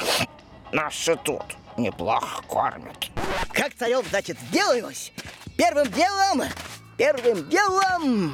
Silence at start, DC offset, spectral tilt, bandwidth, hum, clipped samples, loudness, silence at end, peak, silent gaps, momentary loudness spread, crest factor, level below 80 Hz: 0 s; under 0.1%; -3.5 dB/octave; 18 kHz; none; under 0.1%; -24 LUFS; 0 s; -10 dBFS; none; 12 LU; 14 dB; -48 dBFS